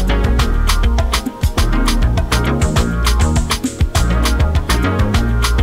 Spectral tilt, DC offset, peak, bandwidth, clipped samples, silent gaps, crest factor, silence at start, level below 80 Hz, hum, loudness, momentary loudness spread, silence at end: -5 dB/octave; under 0.1%; -2 dBFS; 16.5 kHz; under 0.1%; none; 12 dB; 0 s; -16 dBFS; none; -16 LUFS; 2 LU; 0 s